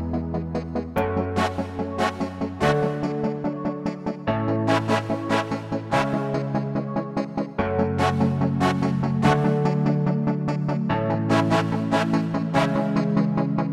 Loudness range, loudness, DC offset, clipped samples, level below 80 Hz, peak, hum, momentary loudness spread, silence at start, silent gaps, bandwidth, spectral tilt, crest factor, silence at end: 3 LU; -24 LUFS; under 0.1%; under 0.1%; -46 dBFS; -4 dBFS; none; 7 LU; 0 s; none; 13 kHz; -7 dB/octave; 18 dB; 0 s